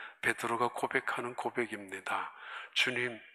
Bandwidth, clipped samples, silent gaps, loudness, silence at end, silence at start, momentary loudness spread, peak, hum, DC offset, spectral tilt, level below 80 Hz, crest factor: 14.5 kHz; under 0.1%; none; -34 LUFS; 0.05 s; 0 s; 8 LU; -14 dBFS; none; under 0.1%; -3 dB/octave; -80 dBFS; 22 dB